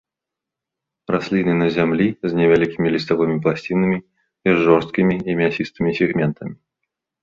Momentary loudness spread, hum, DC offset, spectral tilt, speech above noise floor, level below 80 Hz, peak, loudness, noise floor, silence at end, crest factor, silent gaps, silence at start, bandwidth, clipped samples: 8 LU; none; under 0.1%; -8 dB/octave; 67 dB; -52 dBFS; -2 dBFS; -19 LUFS; -85 dBFS; 0.7 s; 18 dB; none; 1.1 s; 7.4 kHz; under 0.1%